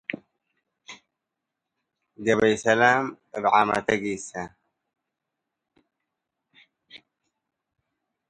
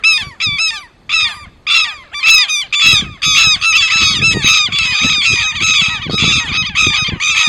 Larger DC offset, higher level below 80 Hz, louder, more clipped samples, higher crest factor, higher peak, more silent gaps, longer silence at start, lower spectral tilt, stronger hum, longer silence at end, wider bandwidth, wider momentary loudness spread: neither; second, -64 dBFS vs -38 dBFS; second, -23 LUFS vs -10 LUFS; second, under 0.1% vs 0.2%; first, 24 dB vs 12 dB; second, -4 dBFS vs 0 dBFS; neither; about the same, 0.1 s vs 0.05 s; first, -4.5 dB/octave vs 0 dB/octave; neither; first, 1.3 s vs 0 s; second, 11.5 kHz vs over 20 kHz; first, 22 LU vs 7 LU